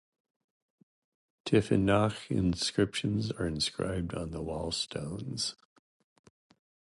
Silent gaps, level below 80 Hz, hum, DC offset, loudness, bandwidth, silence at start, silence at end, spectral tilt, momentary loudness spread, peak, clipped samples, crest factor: none; -52 dBFS; none; under 0.1%; -31 LUFS; 11.5 kHz; 1.45 s; 1.35 s; -5 dB/octave; 10 LU; -12 dBFS; under 0.1%; 20 dB